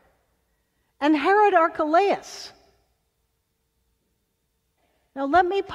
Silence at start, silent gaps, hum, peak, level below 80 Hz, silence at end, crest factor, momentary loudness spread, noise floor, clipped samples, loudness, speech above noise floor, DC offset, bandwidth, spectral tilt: 1 s; none; none; -6 dBFS; -62 dBFS; 0 s; 20 dB; 21 LU; -73 dBFS; under 0.1%; -21 LUFS; 53 dB; under 0.1%; 12 kHz; -4 dB/octave